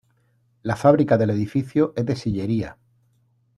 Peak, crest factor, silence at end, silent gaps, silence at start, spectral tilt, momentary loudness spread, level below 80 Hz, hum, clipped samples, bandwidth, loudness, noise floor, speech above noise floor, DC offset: -2 dBFS; 20 dB; 0.85 s; none; 0.65 s; -8 dB/octave; 11 LU; -52 dBFS; none; under 0.1%; 12 kHz; -21 LUFS; -64 dBFS; 44 dB; under 0.1%